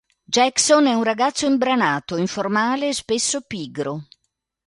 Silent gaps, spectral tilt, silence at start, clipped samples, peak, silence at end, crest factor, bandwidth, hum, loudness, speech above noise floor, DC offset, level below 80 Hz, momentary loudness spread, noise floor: none; -3 dB/octave; 0.3 s; under 0.1%; -4 dBFS; 0.65 s; 18 dB; 11.5 kHz; none; -20 LUFS; 56 dB; under 0.1%; -62 dBFS; 12 LU; -76 dBFS